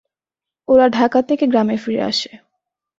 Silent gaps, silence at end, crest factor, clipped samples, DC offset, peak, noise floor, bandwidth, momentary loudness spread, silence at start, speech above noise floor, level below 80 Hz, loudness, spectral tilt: none; 0.6 s; 16 dB; under 0.1%; under 0.1%; -2 dBFS; -88 dBFS; 7.8 kHz; 10 LU; 0.7 s; 73 dB; -58 dBFS; -16 LUFS; -5 dB/octave